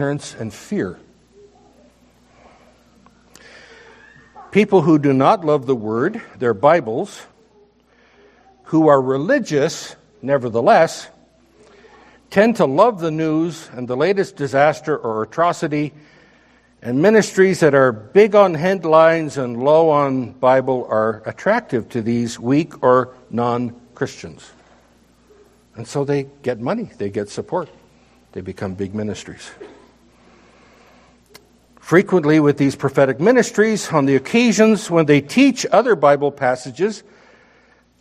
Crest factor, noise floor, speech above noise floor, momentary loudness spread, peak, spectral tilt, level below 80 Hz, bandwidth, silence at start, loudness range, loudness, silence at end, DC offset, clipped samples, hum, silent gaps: 18 dB; -54 dBFS; 38 dB; 14 LU; 0 dBFS; -6 dB/octave; -60 dBFS; 14 kHz; 0 s; 12 LU; -17 LUFS; 1 s; under 0.1%; under 0.1%; none; none